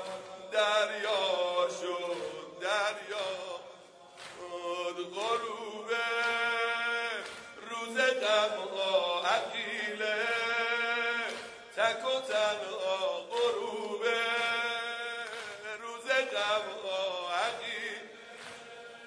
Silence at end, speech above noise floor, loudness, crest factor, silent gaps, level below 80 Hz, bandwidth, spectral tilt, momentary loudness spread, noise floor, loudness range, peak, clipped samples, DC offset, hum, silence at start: 0 s; 21 dB; -32 LUFS; 20 dB; none; -80 dBFS; 11 kHz; -1 dB/octave; 13 LU; -53 dBFS; 5 LU; -14 dBFS; under 0.1%; under 0.1%; none; 0 s